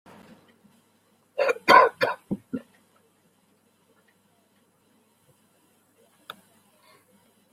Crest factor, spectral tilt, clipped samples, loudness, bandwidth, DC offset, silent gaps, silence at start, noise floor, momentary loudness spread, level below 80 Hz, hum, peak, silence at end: 26 dB; -4 dB/octave; under 0.1%; -22 LUFS; 16 kHz; under 0.1%; none; 1.35 s; -65 dBFS; 29 LU; -72 dBFS; none; -2 dBFS; 4.95 s